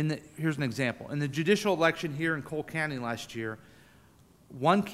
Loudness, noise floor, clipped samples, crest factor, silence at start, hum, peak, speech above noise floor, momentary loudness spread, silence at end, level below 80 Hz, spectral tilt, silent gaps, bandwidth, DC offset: -30 LUFS; -59 dBFS; under 0.1%; 22 dB; 0 s; none; -10 dBFS; 30 dB; 11 LU; 0 s; -64 dBFS; -5.5 dB/octave; none; 15.5 kHz; under 0.1%